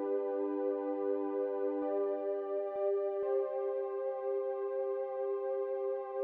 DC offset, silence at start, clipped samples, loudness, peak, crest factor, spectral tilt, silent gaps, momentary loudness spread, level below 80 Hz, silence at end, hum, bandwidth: under 0.1%; 0 s; under 0.1%; -36 LUFS; -24 dBFS; 12 dB; -4 dB/octave; none; 3 LU; -90 dBFS; 0 s; none; 3.4 kHz